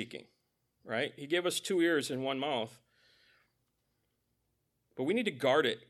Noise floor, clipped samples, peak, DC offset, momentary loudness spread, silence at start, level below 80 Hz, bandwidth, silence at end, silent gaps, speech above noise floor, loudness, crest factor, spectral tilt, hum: -80 dBFS; under 0.1%; -14 dBFS; under 0.1%; 15 LU; 0 s; -84 dBFS; 14.5 kHz; 0.1 s; none; 47 dB; -32 LUFS; 20 dB; -4 dB/octave; none